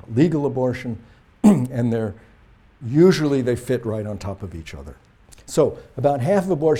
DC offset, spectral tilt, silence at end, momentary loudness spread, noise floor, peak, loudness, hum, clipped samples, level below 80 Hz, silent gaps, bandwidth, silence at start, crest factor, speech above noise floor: under 0.1%; -7.5 dB/octave; 0 s; 18 LU; -51 dBFS; -2 dBFS; -20 LUFS; none; under 0.1%; -48 dBFS; none; 15.5 kHz; 0.1 s; 18 dB; 32 dB